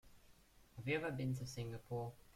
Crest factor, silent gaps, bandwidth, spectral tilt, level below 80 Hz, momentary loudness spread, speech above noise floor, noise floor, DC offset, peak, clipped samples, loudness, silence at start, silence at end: 18 dB; none; 16 kHz; -6 dB/octave; -68 dBFS; 8 LU; 23 dB; -67 dBFS; under 0.1%; -28 dBFS; under 0.1%; -44 LUFS; 0.05 s; 0.05 s